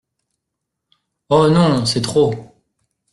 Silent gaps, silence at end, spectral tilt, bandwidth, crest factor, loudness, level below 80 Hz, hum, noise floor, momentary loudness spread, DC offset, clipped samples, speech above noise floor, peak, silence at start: none; 0.7 s; -6 dB/octave; 12 kHz; 16 dB; -15 LUFS; -50 dBFS; none; -79 dBFS; 6 LU; under 0.1%; under 0.1%; 64 dB; -2 dBFS; 1.3 s